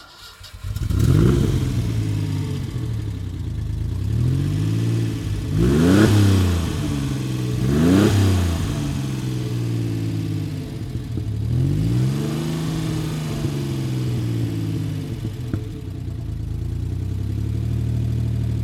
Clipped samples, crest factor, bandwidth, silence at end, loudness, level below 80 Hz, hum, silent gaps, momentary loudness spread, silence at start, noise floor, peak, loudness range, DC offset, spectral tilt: under 0.1%; 20 dB; 15.5 kHz; 0 s; -22 LUFS; -32 dBFS; none; none; 12 LU; 0 s; -41 dBFS; 0 dBFS; 8 LU; under 0.1%; -7 dB/octave